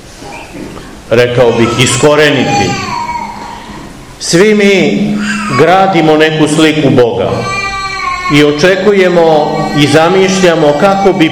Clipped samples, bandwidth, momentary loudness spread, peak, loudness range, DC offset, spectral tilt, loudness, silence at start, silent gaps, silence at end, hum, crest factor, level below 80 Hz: 4%; 18 kHz; 18 LU; 0 dBFS; 3 LU; 0.6%; -5 dB/octave; -8 LUFS; 0 s; none; 0 s; none; 8 dB; -36 dBFS